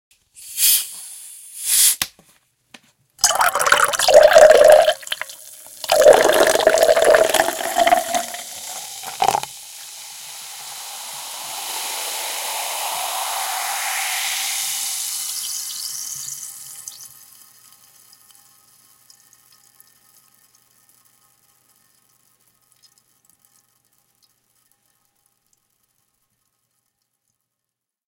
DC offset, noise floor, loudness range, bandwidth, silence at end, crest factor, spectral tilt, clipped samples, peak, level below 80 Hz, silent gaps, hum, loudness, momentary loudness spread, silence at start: under 0.1%; -83 dBFS; 15 LU; 17 kHz; 11.05 s; 20 dB; 0 dB/octave; under 0.1%; 0 dBFS; -58 dBFS; none; none; -17 LUFS; 22 LU; 0.4 s